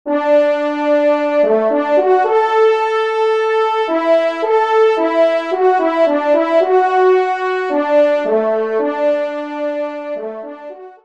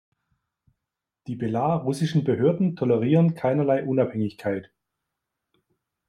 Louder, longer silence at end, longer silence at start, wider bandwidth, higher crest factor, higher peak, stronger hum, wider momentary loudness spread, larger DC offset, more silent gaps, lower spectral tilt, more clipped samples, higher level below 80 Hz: first, -14 LUFS vs -24 LUFS; second, 0.15 s vs 1.45 s; second, 0.05 s vs 1.3 s; second, 8.6 kHz vs 11.5 kHz; second, 12 dB vs 18 dB; first, -2 dBFS vs -6 dBFS; neither; about the same, 9 LU vs 10 LU; first, 0.2% vs under 0.1%; neither; second, -4.5 dB/octave vs -8.5 dB/octave; neither; about the same, -70 dBFS vs -66 dBFS